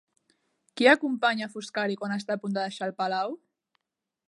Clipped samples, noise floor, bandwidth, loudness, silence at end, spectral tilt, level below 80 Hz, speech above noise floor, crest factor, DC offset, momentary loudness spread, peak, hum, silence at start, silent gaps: under 0.1%; -87 dBFS; 11.5 kHz; -27 LUFS; 0.9 s; -4.5 dB/octave; -82 dBFS; 60 dB; 24 dB; under 0.1%; 13 LU; -6 dBFS; none; 0.75 s; none